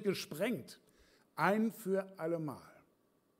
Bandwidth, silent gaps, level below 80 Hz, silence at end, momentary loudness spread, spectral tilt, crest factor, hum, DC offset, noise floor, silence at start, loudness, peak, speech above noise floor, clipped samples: 16 kHz; none; -82 dBFS; 0.7 s; 17 LU; -5.5 dB/octave; 22 dB; none; under 0.1%; -74 dBFS; 0 s; -37 LUFS; -16 dBFS; 38 dB; under 0.1%